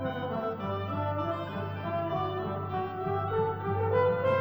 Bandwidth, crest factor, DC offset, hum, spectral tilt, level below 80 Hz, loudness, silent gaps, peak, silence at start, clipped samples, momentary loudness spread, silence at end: over 20 kHz; 16 dB; under 0.1%; none; -9 dB/octave; -58 dBFS; -31 LUFS; none; -16 dBFS; 0 s; under 0.1%; 7 LU; 0 s